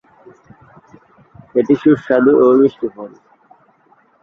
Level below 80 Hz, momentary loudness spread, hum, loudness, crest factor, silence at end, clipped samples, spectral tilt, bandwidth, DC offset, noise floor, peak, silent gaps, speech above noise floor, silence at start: -58 dBFS; 17 LU; none; -13 LUFS; 16 dB; 1.15 s; under 0.1%; -9 dB/octave; 6.6 kHz; under 0.1%; -54 dBFS; 0 dBFS; none; 40 dB; 1.55 s